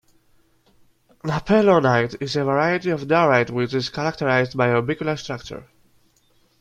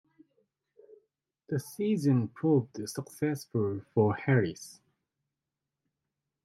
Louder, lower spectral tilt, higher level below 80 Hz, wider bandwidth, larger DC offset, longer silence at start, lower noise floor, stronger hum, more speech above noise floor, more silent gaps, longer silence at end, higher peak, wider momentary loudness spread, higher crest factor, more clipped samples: first, -20 LUFS vs -30 LUFS; about the same, -6.5 dB/octave vs -7 dB/octave; first, -54 dBFS vs -74 dBFS; second, 11.5 kHz vs 15.5 kHz; neither; second, 1.25 s vs 1.5 s; second, -61 dBFS vs -88 dBFS; neither; second, 41 dB vs 59 dB; neither; second, 0.95 s vs 1.7 s; first, -4 dBFS vs -12 dBFS; about the same, 13 LU vs 11 LU; about the same, 18 dB vs 20 dB; neither